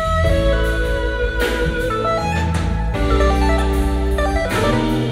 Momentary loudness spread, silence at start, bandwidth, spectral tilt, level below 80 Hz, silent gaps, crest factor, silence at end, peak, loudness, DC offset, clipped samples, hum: 4 LU; 0 s; 16 kHz; -6 dB/octave; -20 dBFS; none; 14 dB; 0 s; -4 dBFS; -18 LUFS; under 0.1%; under 0.1%; none